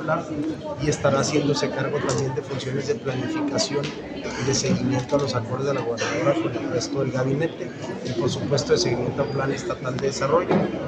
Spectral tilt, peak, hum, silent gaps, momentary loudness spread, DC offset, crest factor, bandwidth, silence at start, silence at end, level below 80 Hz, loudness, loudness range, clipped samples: -5 dB/octave; -6 dBFS; none; none; 7 LU; under 0.1%; 18 dB; 9.8 kHz; 0 s; 0 s; -50 dBFS; -24 LUFS; 1 LU; under 0.1%